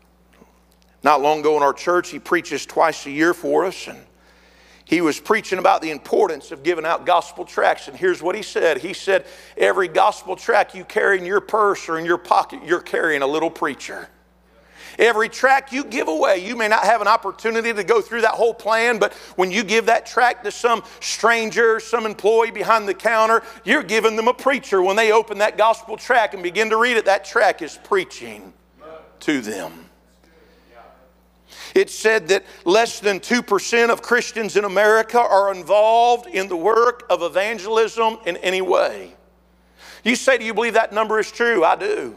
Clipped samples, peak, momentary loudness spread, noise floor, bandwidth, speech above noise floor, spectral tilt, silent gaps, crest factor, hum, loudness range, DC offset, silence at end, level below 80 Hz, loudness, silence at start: under 0.1%; 0 dBFS; 7 LU; -55 dBFS; 15.5 kHz; 36 dB; -3 dB/octave; none; 20 dB; none; 4 LU; under 0.1%; 0 s; -60 dBFS; -19 LUFS; 1.05 s